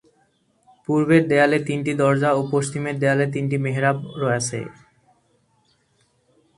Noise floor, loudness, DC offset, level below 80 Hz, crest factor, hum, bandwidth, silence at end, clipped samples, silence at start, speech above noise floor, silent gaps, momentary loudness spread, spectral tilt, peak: -64 dBFS; -20 LUFS; under 0.1%; -62 dBFS; 20 dB; none; 11.5 kHz; 1.85 s; under 0.1%; 0.9 s; 44 dB; none; 9 LU; -6 dB/octave; -2 dBFS